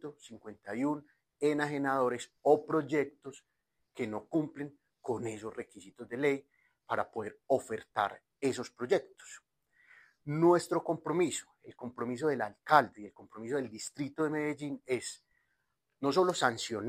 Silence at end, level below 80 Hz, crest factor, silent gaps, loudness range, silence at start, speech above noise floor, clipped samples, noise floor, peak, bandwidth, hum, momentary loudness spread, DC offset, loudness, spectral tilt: 0 s; -76 dBFS; 24 dB; none; 6 LU; 0.05 s; 48 dB; under 0.1%; -81 dBFS; -10 dBFS; 15.5 kHz; none; 20 LU; under 0.1%; -33 LUFS; -5 dB/octave